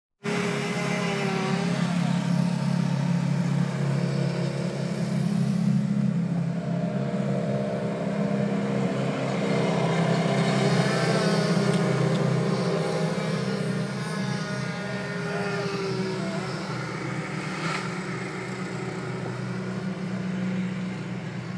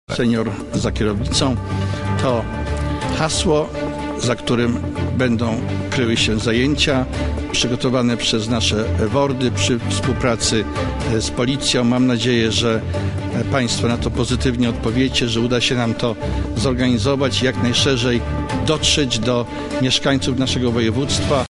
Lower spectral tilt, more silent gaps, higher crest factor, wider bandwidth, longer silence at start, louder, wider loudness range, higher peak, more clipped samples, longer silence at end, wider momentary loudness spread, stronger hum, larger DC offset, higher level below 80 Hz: first, -6.5 dB/octave vs -4.5 dB/octave; neither; about the same, 16 dB vs 16 dB; about the same, 11 kHz vs 11.5 kHz; first, 0.25 s vs 0.1 s; second, -27 LUFS vs -18 LUFS; first, 7 LU vs 2 LU; second, -10 dBFS vs -2 dBFS; neither; about the same, 0 s vs 0.05 s; about the same, 8 LU vs 6 LU; neither; neither; second, -62 dBFS vs -32 dBFS